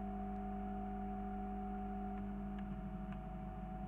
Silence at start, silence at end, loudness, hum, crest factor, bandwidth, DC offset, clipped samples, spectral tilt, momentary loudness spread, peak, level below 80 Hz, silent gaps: 0 s; 0 s; -45 LUFS; 50 Hz at -45 dBFS; 10 dB; 3.7 kHz; under 0.1%; under 0.1%; -10 dB/octave; 3 LU; -34 dBFS; -50 dBFS; none